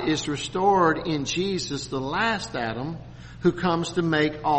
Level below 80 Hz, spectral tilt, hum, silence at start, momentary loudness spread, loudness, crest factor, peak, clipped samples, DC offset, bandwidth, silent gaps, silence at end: -48 dBFS; -5 dB/octave; none; 0 s; 9 LU; -25 LUFS; 16 dB; -8 dBFS; under 0.1%; under 0.1%; 8.8 kHz; none; 0 s